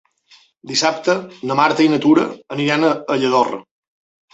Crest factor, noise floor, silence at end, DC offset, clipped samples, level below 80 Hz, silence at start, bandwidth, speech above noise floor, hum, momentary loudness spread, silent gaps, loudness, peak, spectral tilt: 16 dB; -52 dBFS; 0.7 s; under 0.1%; under 0.1%; -64 dBFS; 0.65 s; 8 kHz; 36 dB; none; 8 LU; none; -17 LUFS; -2 dBFS; -4.5 dB/octave